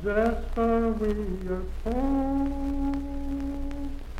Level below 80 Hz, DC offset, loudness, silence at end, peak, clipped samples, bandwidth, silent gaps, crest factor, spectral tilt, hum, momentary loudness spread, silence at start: -32 dBFS; under 0.1%; -29 LUFS; 0 s; -12 dBFS; under 0.1%; 12 kHz; none; 16 dB; -8 dB/octave; none; 8 LU; 0 s